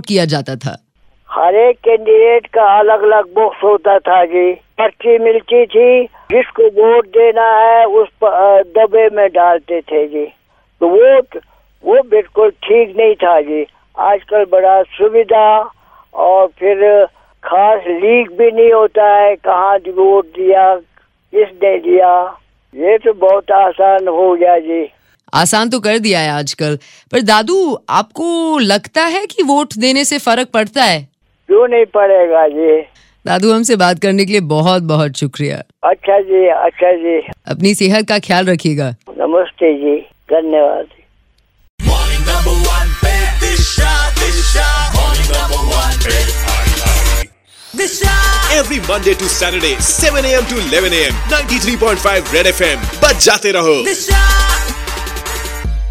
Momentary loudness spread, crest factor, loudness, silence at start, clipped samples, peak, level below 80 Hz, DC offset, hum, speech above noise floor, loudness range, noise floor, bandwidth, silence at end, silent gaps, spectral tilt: 9 LU; 12 dB; -11 LUFS; 0.05 s; under 0.1%; 0 dBFS; -22 dBFS; under 0.1%; none; 43 dB; 4 LU; -53 dBFS; 16.5 kHz; 0 s; 41.70-41.78 s; -4 dB/octave